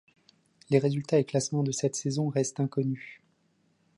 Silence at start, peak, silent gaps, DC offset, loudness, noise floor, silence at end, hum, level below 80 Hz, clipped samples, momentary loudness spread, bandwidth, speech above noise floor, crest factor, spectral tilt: 0.7 s; -10 dBFS; none; under 0.1%; -29 LUFS; -70 dBFS; 0.85 s; none; -72 dBFS; under 0.1%; 6 LU; 11.5 kHz; 42 dB; 20 dB; -6 dB/octave